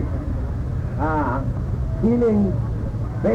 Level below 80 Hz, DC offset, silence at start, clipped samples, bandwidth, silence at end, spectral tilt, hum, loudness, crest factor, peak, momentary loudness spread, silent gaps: -30 dBFS; under 0.1%; 0 s; under 0.1%; 7.6 kHz; 0 s; -10 dB/octave; none; -23 LUFS; 12 dB; -8 dBFS; 8 LU; none